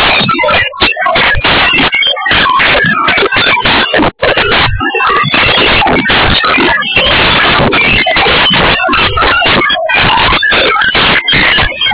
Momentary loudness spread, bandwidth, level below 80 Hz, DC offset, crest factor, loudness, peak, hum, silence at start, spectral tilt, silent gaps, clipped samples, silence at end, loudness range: 3 LU; 4 kHz; -26 dBFS; under 0.1%; 8 dB; -6 LUFS; 0 dBFS; none; 0 s; -7.5 dB/octave; none; under 0.1%; 0 s; 1 LU